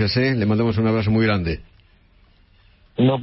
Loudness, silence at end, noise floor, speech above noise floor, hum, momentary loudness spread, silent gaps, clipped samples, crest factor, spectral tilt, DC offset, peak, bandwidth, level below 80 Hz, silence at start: -20 LUFS; 0 s; -54 dBFS; 35 dB; none; 10 LU; none; under 0.1%; 14 dB; -11 dB/octave; under 0.1%; -6 dBFS; 5.8 kHz; -42 dBFS; 0 s